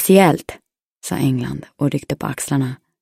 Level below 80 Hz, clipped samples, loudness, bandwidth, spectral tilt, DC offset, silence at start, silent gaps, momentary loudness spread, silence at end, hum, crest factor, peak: -50 dBFS; under 0.1%; -19 LUFS; 16 kHz; -5.5 dB/octave; under 0.1%; 0 s; 0.83-1.01 s; 14 LU; 0.25 s; none; 18 dB; 0 dBFS